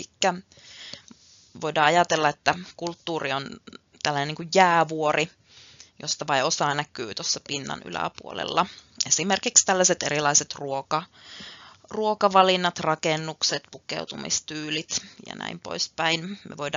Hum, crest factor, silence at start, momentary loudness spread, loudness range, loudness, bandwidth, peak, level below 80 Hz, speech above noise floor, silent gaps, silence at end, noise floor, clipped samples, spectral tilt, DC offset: none; 24 dB; 0 s; 17 LU; 5 LU; -24 LUFS; 7.6 kHz; -2 dBFS; -68 dBFS; 27 dB; none; 0 s; -53 dBFS; under 0.1%; -2 dB/octave; under 0.1%